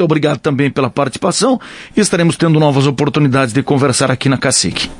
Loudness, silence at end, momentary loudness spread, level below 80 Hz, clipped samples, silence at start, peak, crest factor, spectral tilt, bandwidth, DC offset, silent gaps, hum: -13 LUFS; 0 s; 4 LU; -46 dBFS; under 0.1%; 0 s; 0 dBFS; 12 dB; -5 dB/octave; 11.5 kHz; under 0.1%; none; none